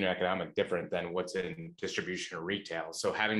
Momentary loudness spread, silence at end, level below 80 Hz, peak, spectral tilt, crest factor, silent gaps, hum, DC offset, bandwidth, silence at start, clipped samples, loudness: 6 LU; 0 s; -68 dBFS; -14 dBFS; -4 dB/octave; 20 dB; none; none; under 0.1%; 12.5 kHz; 0 s; under 0.1%; -35 LUFS